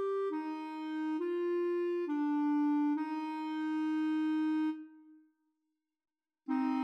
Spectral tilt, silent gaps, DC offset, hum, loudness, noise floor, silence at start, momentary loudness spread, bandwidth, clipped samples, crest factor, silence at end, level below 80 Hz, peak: -5.5 dB/octave; none; under 0.1%; none; -34 LUFS; -86 dBFS; 0 s; 8 LU; 6 kHz; under 0.1%; 12 dB; 0 s; under -90 dBFS; -24 dBFS